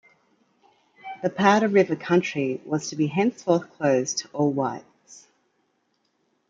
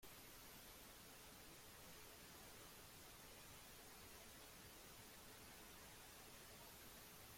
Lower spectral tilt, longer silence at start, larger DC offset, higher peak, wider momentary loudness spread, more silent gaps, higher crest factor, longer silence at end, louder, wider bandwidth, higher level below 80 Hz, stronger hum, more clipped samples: first, -5 dB/octave vs -2 dB/octave; first, 1.05 s vs 0 s; neither; first, -4 dBFS vs -48 dBFS; first, 10 LU vs 1 LU; neither; first, 22 dB vs 14 dB; first, 1.3 s vs 0 s; first, -23 LUFS vs -60 LUFS; second, 7.8 kHz vs 16.5 kHz; about the same, -70 dBFS vs -74 dBFS; neither; neither